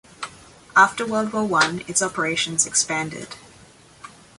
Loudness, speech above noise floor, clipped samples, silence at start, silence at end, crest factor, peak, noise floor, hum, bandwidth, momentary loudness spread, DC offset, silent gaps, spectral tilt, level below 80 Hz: -20 LUFS; 28 dB; under 0.1%; 0.2 s; 0.3 s; 22 dB; -2 dBFS; -49 dBFS; none; 11.5 kHz; 19 LU; under 0.1%; none; -2 dB/octave; -60 dBFS